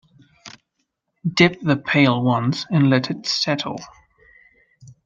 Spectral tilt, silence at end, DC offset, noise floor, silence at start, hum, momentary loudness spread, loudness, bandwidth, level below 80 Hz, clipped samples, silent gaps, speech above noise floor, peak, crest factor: -5.5 dB/octave; 0.15 s; under 0.1%; -74 dBFS; 0.45 s; none; 9 LU; -19 LUFS; 7.6 kHz; -62 dBFS; under 0.1%; none; 56 dB; -2 dBFS; 20 dB